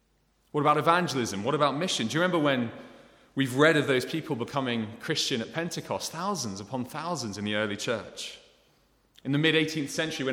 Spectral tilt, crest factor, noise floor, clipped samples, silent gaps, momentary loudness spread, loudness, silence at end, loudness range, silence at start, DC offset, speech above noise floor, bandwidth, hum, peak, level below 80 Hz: -4.5 dB/octave; 22 dB; -68 dBFS; under 0.1%; none; 12 LU; -28 LUFS; 0 s; 6 LU; 0.55 s; under 0.1%; 41 dB; 17.5 kHz; none; -6 dBFS; -68 dBFS